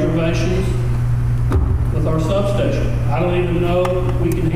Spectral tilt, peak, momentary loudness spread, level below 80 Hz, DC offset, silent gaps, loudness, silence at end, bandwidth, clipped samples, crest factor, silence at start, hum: -7.5 dB/octave; -4 dBFS; 2 LU; -24 dBFS; under 0.1%; none; -18 LUFS; 0 s; 14.5 kHz; under 0.1%; 12 dB; 0 s; none